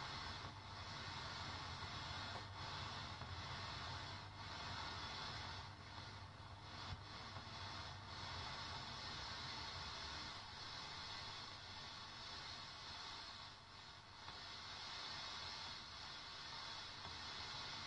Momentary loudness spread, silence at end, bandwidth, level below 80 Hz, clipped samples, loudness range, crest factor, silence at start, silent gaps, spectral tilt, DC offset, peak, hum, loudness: 5 LU; 0 s; 11 kHz; -68 dBFS; under 0.1%; 3 LU; 16 dB; 0 s; none; -3 dB/octave; under 0.1%; -36 dBFS; none; -50 LUFS